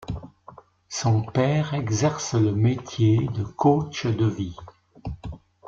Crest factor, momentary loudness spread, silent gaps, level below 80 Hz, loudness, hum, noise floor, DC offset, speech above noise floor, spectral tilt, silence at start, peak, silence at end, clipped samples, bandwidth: 18 dB; 16 LU; none; -48 dBFS; -23 LUFS; none; -49 dBFS; under 0.1%; 27 dB; -6.5 dB/octave; 0 s; -6 dBFS; 0.3 s; under 0.1%; 7.6 kHz